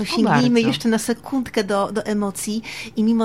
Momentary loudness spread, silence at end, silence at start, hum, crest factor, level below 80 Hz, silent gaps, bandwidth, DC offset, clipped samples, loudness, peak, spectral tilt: 10 LU; 0 s; 0 s; none; 16 dB; -54 dBFS; none; 15.5 kHz; 0.3%; under 0.1%; -20 LUFS; -4 dBFS; -5 dB/octave